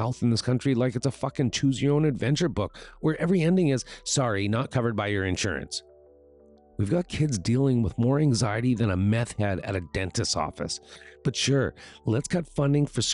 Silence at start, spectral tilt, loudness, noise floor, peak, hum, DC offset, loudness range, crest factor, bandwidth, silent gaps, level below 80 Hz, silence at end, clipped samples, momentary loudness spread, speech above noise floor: 0 s; -5.5 dB/octave; -26 LUFS; -55 dBFS; -14 dBFS; none; under 0.1%; 3 LU; 12 dB; 11.5 kHz; none; -50 dBFS; 0 s; under 0.1%; 9 LU; 29 dB